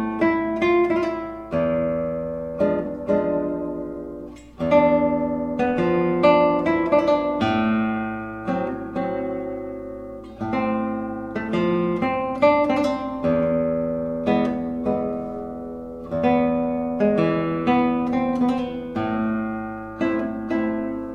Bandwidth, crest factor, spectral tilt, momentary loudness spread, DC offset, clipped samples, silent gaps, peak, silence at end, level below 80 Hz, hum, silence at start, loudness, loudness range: 8 kHz; 18 dB; -8 dB/octave; 12 LU; under 0.1%; under 0.1%; none; -4 dBFS; 0 s; -48 dBFS; none; 0 s; -22 LUFS; 6 LU